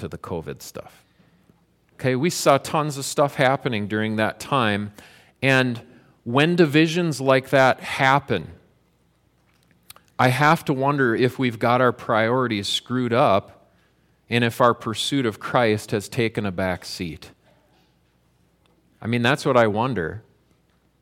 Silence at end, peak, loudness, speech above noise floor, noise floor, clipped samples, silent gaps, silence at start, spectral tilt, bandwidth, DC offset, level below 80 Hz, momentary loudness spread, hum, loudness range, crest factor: 0.8 s; -2 dBFS; -21 LUFS; 42 dB; -63 dBFS; under 0.1%; none; 0 s; -5 dB/octave; 16.5 kHz; under 0.1%; -58 dBFS; 14 LU; none; 5 LU; 20 dB